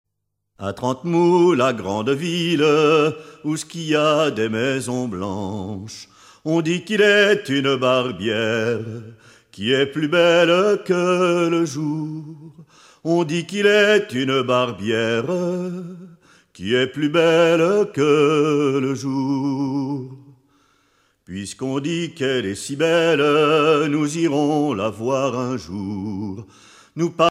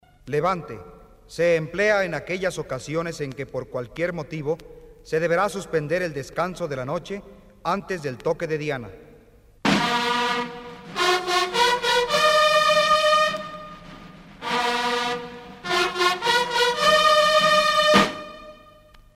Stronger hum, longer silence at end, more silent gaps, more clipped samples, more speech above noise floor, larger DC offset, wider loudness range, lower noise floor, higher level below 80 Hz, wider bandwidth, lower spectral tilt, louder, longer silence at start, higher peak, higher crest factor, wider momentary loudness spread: neither; second, 0 s vs 0.6 s; neither; neither; first, 58 dB vs 26 dB; neither; second, 4 LU vs 9 LU; first, -77 dBFS vs -52 dBFS; second, -64 dBFS vs -52 dBFS; second, 13.5 kHz vs 16 kHz; first, -5 dB/octave vs -3.5 dB/octave; first, -19 LUFS vs -22 LUFS; first, 0.6 s vs 0.25 s; about the same, -4 dBFS vs -4 dBFS; about the same, 16 dB vs 20 dB; about the same, 15 LU vs 16 LU